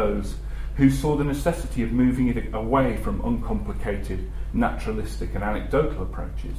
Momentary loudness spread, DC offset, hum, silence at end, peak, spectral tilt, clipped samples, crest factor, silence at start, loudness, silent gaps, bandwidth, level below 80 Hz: 11 LU; under 0.1%; none; 0 s; -6 dBFS; -7.5 dB/octave; under 0.1%; 18 dB; 0 s; -25 LUFS; none; 15.5 kHz; -30 dBFS